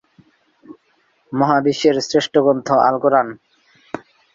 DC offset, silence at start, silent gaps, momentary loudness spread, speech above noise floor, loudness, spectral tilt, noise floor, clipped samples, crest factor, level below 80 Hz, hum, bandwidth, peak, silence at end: under 0.1%; 0.7 s; none; 19 LU; 46 dB; -16 LUFS; -5 dB/octave; -61 dBFS; under 0.1%; 18 dB; -62 dBFS; none; 7.6 kHz; -2 dBFS; 0.35 s